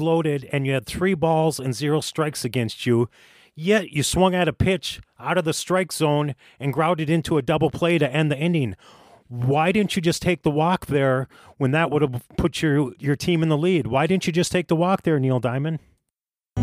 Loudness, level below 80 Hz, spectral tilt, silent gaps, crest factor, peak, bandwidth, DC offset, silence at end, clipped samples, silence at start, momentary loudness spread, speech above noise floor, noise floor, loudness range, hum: -22 LUFS; -46 dBFS; -5.5 dB/octave; none; 16 dB; -6 dBFS; 16 kHz; under 0.1%; 0 s; under 0.1%; 0 s; 7 LU; 63 dB; -85 dBFS; 1 LU; none